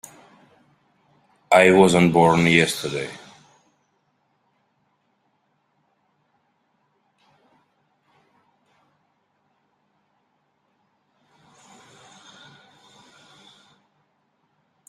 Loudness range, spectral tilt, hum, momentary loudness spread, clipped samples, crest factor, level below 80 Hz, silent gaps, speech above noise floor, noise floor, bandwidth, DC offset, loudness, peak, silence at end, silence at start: 17 LU; -5 dB/octave; none; 21 LU; under 0.1%; 24 dB; -62 dBFS; none; 53 dB; -69 dBFS; 15 kHz; under 0.1%; -17 LUFS; -2 dBFS; 11.7 s; 1.5 s